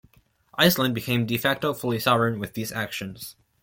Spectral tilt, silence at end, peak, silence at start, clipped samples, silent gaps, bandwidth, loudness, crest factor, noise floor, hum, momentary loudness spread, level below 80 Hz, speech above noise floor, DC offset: -4.5 dB/octave; 0.3 s; -4 dBFS; 0.55 s; under 0.1%; none; 17 kHz; -24 LUFS; 22 dB; -59 dBFS; none; 16 LU; -58 dBFS; 35 dB; under 0.1%